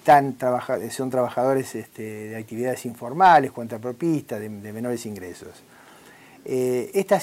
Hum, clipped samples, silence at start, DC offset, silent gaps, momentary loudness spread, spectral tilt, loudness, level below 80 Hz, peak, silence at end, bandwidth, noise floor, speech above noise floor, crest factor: none; under 0.1%; 0.05 s; under 0.1%; none; 17 LU; -5.5 dB/octave; -23 LUFS; -66 dBFS; -6 dBFS; 0 s; 16 kHz; -49 dBFS; 26 dB; 18 dB